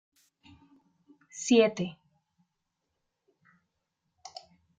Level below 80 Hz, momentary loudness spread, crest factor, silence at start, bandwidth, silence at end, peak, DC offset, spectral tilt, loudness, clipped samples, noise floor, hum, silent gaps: -76 dBFS; 25 LU; 24 dB; 1.35 s; 9.4 kHz; 2.85 s; -10 dBFS; under 0.1%; -4.5 dB/octave; -27 LUFS; under 0.1%; -83 dBFS; none; none